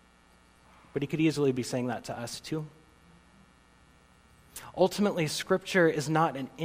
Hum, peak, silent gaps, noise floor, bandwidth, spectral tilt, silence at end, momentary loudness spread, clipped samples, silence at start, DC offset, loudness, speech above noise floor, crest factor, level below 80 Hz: none; -12 dBFS; none; -61 dBFS; 16 kHz; -5 dB/octave; 0 s; 13 LU; under 0.1%; 0.95 s; under 0.1%; -29 LUFS; 32 dB; 20 dB; -64 dBFS